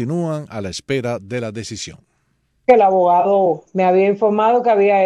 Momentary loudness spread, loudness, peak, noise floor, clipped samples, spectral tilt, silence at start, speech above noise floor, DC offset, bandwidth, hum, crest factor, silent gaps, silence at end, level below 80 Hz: 14 LU; -16 LUFS; 0 dBFS; -64 dBFS; under 0.1%; -6 dB/octave; 0 s; 49 dB; under 0.1%; 11 kHz; none; 16 dB; none; 0 s; -56 dBFS